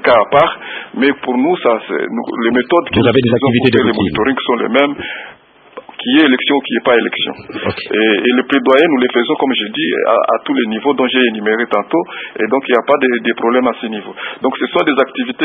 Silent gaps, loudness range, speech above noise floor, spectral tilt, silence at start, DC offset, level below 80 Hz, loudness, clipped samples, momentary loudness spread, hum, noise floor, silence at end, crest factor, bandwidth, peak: none; 2 LU; 23 dB; -8 dB/octave; 0 s; under 0.1%; -50 dBFS; -13 LUFS; under 0.1%; 10 LU; none; -36 dBFS; 0 s; 14 dB; 4.8 kHz; 0 dBFS